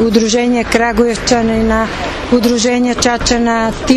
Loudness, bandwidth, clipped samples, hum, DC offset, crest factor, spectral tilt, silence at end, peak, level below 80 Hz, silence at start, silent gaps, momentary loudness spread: -13 LUFS; 14.5 kHz; under 0.1%; none; under 0.1%; 12 dB; -4 dB/octave; 0 s; 0 dBFS; -28 dBFS; 0 s; none; 4 LU